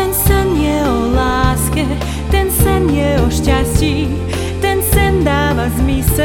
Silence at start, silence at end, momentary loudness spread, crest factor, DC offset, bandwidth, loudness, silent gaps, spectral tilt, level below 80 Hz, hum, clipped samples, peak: 0 s; 0 s; 5 LU; 14 dB; under 0.1%; 18 kHz; -14 LUFS; none; -5.5 dB/octave; -20 dBFS; none; under 0.1%; 0 dBFS